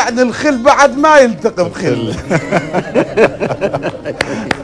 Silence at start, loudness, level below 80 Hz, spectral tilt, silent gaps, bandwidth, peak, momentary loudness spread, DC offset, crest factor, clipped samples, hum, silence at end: 0 s; -13 LUFS; -40 dBFS; -5 dB/octave; none; 11 kHz; 0 dBFS; 11 LU; under 0.1%; 12 dB; 0.5%; none; 0 s